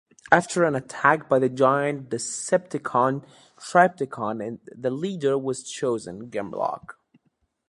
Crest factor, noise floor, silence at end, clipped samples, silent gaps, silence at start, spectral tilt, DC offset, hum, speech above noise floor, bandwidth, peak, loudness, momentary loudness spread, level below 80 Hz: 24 dB; -71 dBFS; 0.8 s; under 0.1%; none; 0.3 s; -5 dB/octave; under 0.1%; none; 47 dB; 11.5 kHz; 0 dBFS; -24 LUFS; 12 LU; -68 dBFS